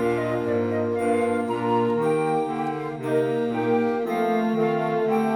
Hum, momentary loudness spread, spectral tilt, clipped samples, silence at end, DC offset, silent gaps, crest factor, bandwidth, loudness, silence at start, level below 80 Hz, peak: none; 3 LU; -7 dB/octave; under 0.1%; 0 s; under 0.1%; none; 12 dB; 14 kHz; -24 LUFS; 0 s; -60 dBFS; -10 dBFS